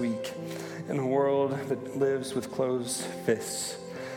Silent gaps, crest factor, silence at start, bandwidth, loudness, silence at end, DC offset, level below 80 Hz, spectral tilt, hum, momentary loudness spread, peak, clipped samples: none; 18 dB; 0 s; 18 kHz; -30 LUFS; 0 s; under 0.1%; -74 dBFS; -4.5 dB/octave; none; 10 LU; -12 dBFS; under 0.1%